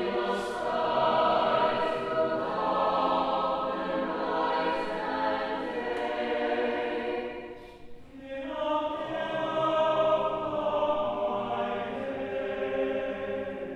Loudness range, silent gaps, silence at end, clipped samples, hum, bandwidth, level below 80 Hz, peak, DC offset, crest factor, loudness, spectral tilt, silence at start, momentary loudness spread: 5 LU; none; 0 s; under 0.1%; none; 11 kHz; -58 dBFS; -14 dBFS; under 0.1%; 16 dB; -29 LUFS; -5.5 dB/octave; 0 s; 9 LU